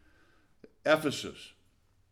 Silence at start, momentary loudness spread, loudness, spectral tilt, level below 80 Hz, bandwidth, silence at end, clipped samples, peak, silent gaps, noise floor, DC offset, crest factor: 0.85 s; 22 LU; -31 LUFS; -4 dB/octave; -68 dBFS; 17.5 kHz; 0.6 s; under 0.1%; -12 dBFS; none; -67 dBFS; under 0.1%; 24 dB